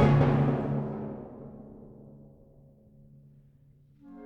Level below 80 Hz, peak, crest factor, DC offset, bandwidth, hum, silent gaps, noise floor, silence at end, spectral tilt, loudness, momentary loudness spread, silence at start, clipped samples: -48 dBFS; -10 dBFS; 20 dB; under 0.1%; 5.6 kHz; none; none; -59 dBFS; 0 s; -9.5 dB/octave; -27 LUFS; 28 LU; 0 s; under 0.1%